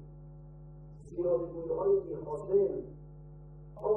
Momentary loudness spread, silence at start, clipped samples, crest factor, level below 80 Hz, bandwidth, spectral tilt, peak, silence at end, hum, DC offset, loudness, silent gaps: 22 LU; 0 s; under 0.1%; 16 dB; -56 dBFS; 2 kHz; -11.5 dB/octave; -18 dBFS; 0 s; none; under 0.1%; -33 LUFS; none